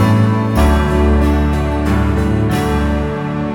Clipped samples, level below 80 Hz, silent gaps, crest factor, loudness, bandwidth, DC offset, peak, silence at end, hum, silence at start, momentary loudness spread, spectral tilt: under 0.1%; -18 dBFS; none; 12 dB; -15 LUFS; 17 kHz; under 0.1%; 0 dBFS; 0 s; none; 0 s; 4 LU; -7.5 dB/octave